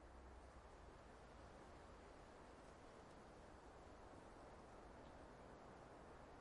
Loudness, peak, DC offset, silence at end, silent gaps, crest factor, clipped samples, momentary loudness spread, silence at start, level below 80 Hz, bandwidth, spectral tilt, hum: -63 LUFS; -48 dBFS; under 0.1%; 0 s; none; 14 dB; under 0.1%; 1 LU; 0 s; -68 dBFS; 11 kHz; -5.5 dB/octave; none